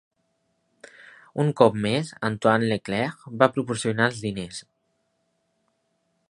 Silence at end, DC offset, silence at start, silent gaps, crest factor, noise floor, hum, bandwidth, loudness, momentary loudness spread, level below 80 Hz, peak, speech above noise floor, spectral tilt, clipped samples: 1.7 s; under 0.1%; 1.35 s; none; 24 dB; -73 dBFS; none; 11.5 kHz; -24 LUFS; 13 LU; -62 dBFS; -2 dBFS; 49 dB; -5.5 dB/octave; under 0.1%